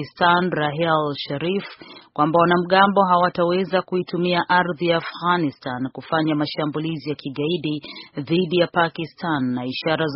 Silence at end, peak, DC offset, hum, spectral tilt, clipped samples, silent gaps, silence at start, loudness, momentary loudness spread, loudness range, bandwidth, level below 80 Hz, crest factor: 0 s; -2 dBFS; under 0.1%; none; -4 dB/octave; under 0.1%; none; 0 s; -21 LUFS; 12 LU; 5 LU; 5.8 kHz; -60 dBFS; 20 dB